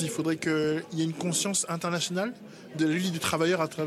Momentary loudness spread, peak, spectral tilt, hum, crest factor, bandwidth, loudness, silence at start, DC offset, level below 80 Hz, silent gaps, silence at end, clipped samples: 6 LU; -12 dBFS; -4 dB/octave; none; 16 dB; 15 kHz; -28 LUFS; 0 s; under 0.1%; -70 dBFS; none; 0 s; under 0.1%